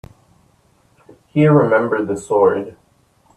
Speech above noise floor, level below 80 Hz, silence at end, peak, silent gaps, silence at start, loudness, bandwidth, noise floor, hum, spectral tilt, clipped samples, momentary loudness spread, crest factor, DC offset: 42 dB; -56 dBFS; 0.65 s; 0 dBFS; none; 1.35 s; -16 LUFS; 10 kHz; -57 dBFS; none; -8 dB/octave; under 0.1%; 12 LU; 18 dB; under 0.1%